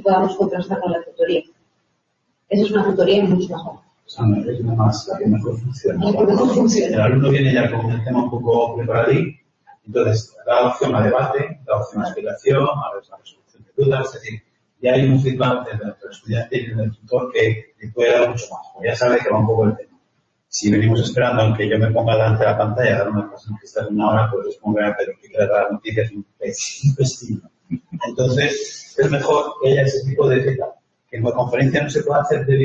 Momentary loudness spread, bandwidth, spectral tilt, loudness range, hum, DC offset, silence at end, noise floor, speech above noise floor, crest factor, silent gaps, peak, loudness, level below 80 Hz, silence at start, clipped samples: 12 LU; 7.8 kHz; -6.5 dB/octave; 4 LU; none; under 0.1%; 0 s; -69 dBFS; 51 dB; 14 dB; none; -4 dBFS; -19 LUFS; -52 dBFS; 0 s; under 0.1%